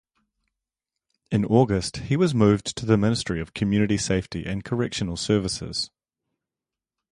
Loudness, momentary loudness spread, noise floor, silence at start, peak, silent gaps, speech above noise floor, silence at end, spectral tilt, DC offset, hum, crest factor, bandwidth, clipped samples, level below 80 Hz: -24 LUFS; 9 LU; -89 dBFS; 1.3 s; -4 dBFS; none; 66 dB; 1.25 s; -5.5 dB/octave; under 0.1%; none; 20 dB; 11.5 kHz; under 0.1%; -46 dBFS